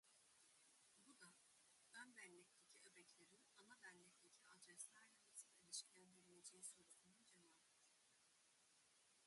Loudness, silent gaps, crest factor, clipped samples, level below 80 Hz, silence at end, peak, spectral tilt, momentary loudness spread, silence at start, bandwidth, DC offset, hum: -62 LUFS; none; 28 dB; under 0.1%; under -90 dBFS; 0 s; -40 dBFS; -0.5 dB/octave; 13 LU; 0.05 s; 11.5 kHz; under 0.1%; none